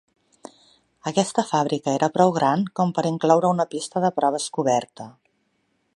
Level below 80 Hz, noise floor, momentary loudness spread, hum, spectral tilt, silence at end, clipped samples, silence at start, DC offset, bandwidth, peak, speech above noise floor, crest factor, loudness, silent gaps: -70 dBFS; -70 dBFS; 7 LU; none; -5.5 dB/octave; 0.85 s; under 0.1%; 1.05 s; under 0.1%; 11.5 kHz; -2 dBFS; 48 dB; 20 dB; -22 LUFS; none